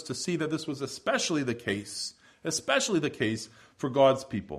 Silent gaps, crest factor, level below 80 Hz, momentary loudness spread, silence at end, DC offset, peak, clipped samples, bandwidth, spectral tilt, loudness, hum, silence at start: none; 20 dB; -66 dBFS; 13 LU; 0 s; under 0.1%; -10 dBFS; under 0.1%; 15 kHz; -4 dB/octave; -29 LUFS; none; 0 s